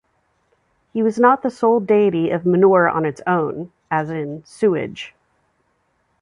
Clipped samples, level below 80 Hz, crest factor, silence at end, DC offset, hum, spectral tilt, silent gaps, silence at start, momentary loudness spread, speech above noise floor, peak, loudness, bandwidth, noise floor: under 0.1%; -62 dBFS; 18 dB; 1.15 s; under 0.1%; none; -7.5 dB/octave; none; 0.95 s; 15 LU; 49 dB; -2 dBFS; -18 LUFS; 10.5 kHz; -66 dBFS